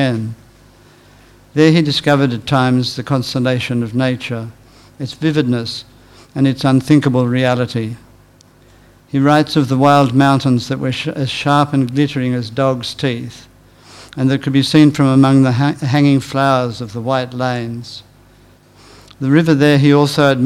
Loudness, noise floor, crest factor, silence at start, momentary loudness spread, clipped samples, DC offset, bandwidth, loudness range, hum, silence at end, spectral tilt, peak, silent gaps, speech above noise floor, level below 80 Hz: -14 LUFS; -47 dBFS; 14 dB; 0 s; 14 LU; 0.2%; under 0.1%; 13 kHz; 5 LU; none; 0 s; -6.5 dB/octave; 0 dBFS; none; 33 dB; -50 dBFS